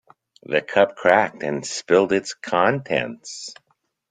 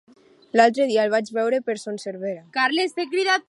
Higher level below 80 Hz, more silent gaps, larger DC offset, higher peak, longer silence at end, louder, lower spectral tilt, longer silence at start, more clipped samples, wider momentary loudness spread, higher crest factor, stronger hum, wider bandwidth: first, -64 dBFS vs -80 dBFS; neither; neither; about the same, -2 dBFS vs -2 dBFS; first, 0.6 s vs 0.1 s; about the same, -21 LUFS vs -22 LUFS; about the same, -4 dB/octave vs -3.5 dB/octave; about the same, 0.5 s vs 0.55 s; neither; first, 15 LU vs 12 LU; about the same, 20 dB vs 20 dB; neither; second, 9.6 kHz vs 11.5 kHz